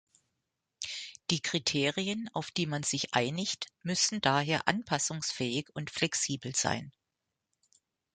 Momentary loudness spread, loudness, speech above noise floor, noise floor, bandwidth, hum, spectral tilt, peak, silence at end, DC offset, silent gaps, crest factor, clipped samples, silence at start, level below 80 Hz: 9 LU; -31 LUFS; 54 dB; -86 dBFS; 9.6 kHz; none; -3 dB/octave; -8 dBFS; 1.25 s; under 0.1%; none; 26 dB; under 0.1%; 0.8 s; -66 dBFS